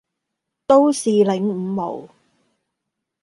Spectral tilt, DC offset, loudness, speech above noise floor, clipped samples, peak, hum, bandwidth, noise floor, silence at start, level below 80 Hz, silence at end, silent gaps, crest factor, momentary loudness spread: -6 dB/octave; under 0.1%; -18 LUFS; 63 dB; under 0.1%; -2 dBFS; none; 11.5 kHz; -80 dBFS; 0.7 s; -66 dBFS; 1.15 s; none; 18 dB; 16 LU